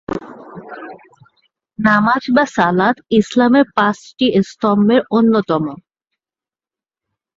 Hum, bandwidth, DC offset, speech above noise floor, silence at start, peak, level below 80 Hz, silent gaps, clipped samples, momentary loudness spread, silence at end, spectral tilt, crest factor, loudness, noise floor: none; 7.8 kHz; under 0.1%; over 75 dB; 0.1 s; -2 dBFS; -54 dBFS; none; under 0.1%; 20 LU; 1.65 s; -6.5 dB/octave; 16 dB; -15 LUFS; under -90 dBFS